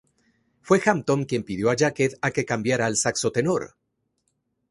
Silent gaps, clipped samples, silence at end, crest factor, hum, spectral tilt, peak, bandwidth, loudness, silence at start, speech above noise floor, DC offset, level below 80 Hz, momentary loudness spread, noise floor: none; under 0.1%; 1.05 s; 20 dB; none; -4.5 dB/octave; -4 dBFS; 11.5 kHz; -23 LUFS; 0.65 s; 51 dB; under 0.1%; -58 dBFS; 5 LU; -74 dBFS